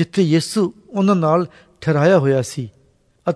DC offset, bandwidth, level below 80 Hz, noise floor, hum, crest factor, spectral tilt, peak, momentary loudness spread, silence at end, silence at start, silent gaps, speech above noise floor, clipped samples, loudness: under 0.1%; 11 kHz; -58 dBFS; -57 dBFS; none; 14 dB; -6.5 dB/octave; -4 dBFS; 14 LU; 0 s; 0 s; none; 40 dB; under 0.1%; -18 LUFS